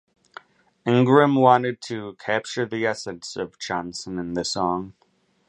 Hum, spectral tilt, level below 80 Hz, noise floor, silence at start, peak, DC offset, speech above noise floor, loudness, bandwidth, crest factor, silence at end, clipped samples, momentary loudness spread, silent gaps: none; -5.5 dB/octave; -60 dBFS; -47 dBFS; 0.85 s; -2 dBFS; under 0.1%; 25 dB; -23 LUFS; 10.5 kHz; 22 dB; 0.6 s; under 0.1%; 15 LU; none